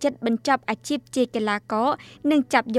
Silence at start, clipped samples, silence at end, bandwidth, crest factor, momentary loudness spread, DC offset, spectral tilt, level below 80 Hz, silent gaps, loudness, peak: 0 s; under 0.1%; 0 s; 14 kHz; 18 dB; 6 LU; under 0.1%; -4 dB/octave; -64 dBFS; none; -24 LUFS; -6 dBFS